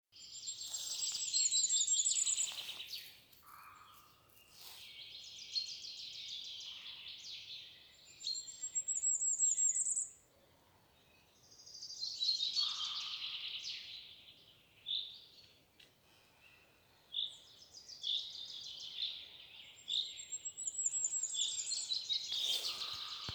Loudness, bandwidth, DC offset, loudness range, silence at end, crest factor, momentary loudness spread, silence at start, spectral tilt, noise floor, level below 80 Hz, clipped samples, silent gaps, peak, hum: -37 LUFS; over 20 kHz; under 0.1%; 11 LU; 0 s; 20 dB; 22 LU; 0.15 s; 3 dB/octave; -69 dBFS; -80 dBFS; under 0.1%; none; -22 dBFS; none